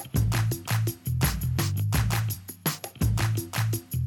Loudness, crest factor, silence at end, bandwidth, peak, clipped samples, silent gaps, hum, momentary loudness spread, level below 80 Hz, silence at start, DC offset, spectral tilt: -28 LUFS; 16 dB; 0 s; 19.5 kHz; -10 dBFS; under 0.1%; none; none; 5 LU; -38 dBFS; 0 s; under 0.1%; -4.5 dB/octave